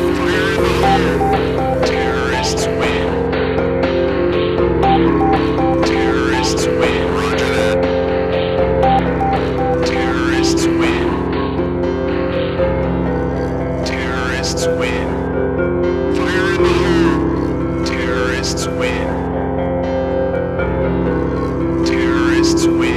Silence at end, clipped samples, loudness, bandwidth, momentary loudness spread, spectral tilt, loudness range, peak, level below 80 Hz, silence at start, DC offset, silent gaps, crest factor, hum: 0 s; under 0.1%; -16 LUFS; 13.5 kHz; 5 LU; -5.5 dB/octave; 3 LU; -2 dBFS; -28 dBFS; 0 s; under 0.1%; none; 14 dB; none